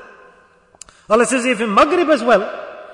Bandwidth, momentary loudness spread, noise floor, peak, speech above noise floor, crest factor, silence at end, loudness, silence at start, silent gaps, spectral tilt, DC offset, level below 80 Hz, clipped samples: 11 kHz; 7 LU; -51 dBFS; -2 dBFS; 36 dB; 16 dB; 0 s; -15 LUFS; 0 s; none; -3.5 dB/octave; under 0.1%; -52 dBFS; under 0.1%